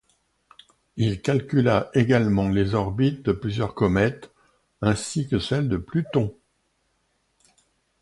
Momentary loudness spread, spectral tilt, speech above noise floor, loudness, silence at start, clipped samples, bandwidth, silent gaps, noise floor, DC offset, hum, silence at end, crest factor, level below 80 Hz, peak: 6 LU; -6.5 dB/octave; 48 dB; -23 LUFS; 0.95 s; under 0.1%; 11.5 kHz; none; -70 dBFS; under 0.1%; none; 1.7 s; 20 dB; -46 dBFS; -6 dBFS